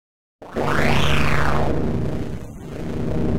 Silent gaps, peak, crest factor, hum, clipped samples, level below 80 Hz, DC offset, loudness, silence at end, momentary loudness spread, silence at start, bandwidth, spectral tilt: none; -6 dBFS; 14 dB; none; under 0.1%; -32 dBFS; under 0.1%; -22 LUFS; 0 s; 13 LU; 0.4 s; 16.5 kHz; -6 dB/octave